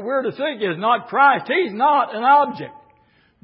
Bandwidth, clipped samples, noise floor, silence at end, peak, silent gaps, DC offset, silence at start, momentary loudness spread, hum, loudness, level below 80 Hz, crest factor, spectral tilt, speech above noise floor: 5.6 kHz; under 0.1%; -58 dBFS; 0.7 s; -4 dBFS; none; under 0.1%; 0 s; 9 LU; none; -18 LUFS; -72 dBFS; 16 dB; -9.5 dB/octave; 40 dB